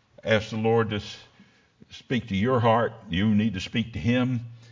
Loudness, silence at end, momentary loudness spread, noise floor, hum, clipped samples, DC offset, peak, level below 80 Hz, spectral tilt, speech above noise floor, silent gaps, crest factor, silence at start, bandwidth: -25 LUFS; 0.15 s; 9 LU; -58 dBFS; none; under 0.1%; under 0.1%; -6 dBFS; -48 dBFS; -7 dB/octave; 33 dB; none; 20 dB; 0.25 s; 7.6 kHz